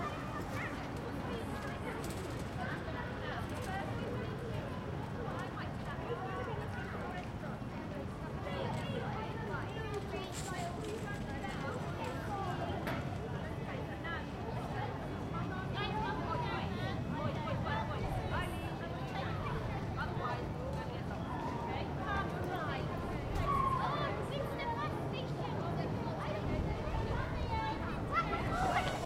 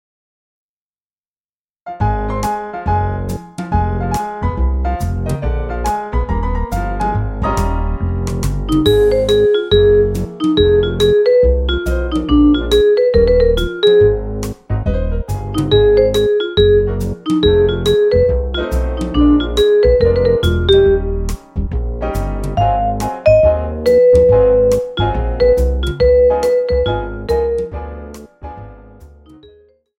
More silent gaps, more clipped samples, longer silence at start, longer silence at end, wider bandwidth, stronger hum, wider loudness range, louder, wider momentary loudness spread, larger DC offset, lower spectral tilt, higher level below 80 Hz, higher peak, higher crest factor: neither; neither; second, 0 s vs 1.85 s; second, 0 s vs 0.9 s; about the same, 16.5 kHz vs 16.5 kHz; neither; second, 4 LU vs 7 LU; second, -39 LUFS vs -14 LUFS; second, 5 LU vs 11 LU; neither; about the same, -6.5 dB/octave vs -7 dB/octave; second, -50 dBFS vs -22 dBFS; second, -20 dBFS vs 0 dBFS; about the same, 18 dB vs 14 dB